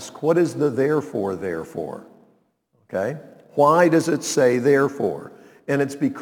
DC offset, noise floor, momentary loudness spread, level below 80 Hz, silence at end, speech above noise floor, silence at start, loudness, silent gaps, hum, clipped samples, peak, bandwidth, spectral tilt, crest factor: under 0.1%; -65 dBFS; 15 LU; -66 dBFS; 0 s; 45 dB; 0 s; -21 LUFS; none; none; under 0.1%; -4 dBFS; 19 kHz; -5.5 dB/octave; 18 dB